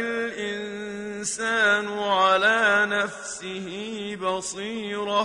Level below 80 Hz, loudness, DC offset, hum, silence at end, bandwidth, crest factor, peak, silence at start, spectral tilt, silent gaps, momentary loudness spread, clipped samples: -64 dBFS; -24 LUFS; under 0.1%; none; 0 s; 11 kHz; 16 dB; -8 dBFS; 0 s; -2.5 dB/octave; none; 14 LU; under 0.1%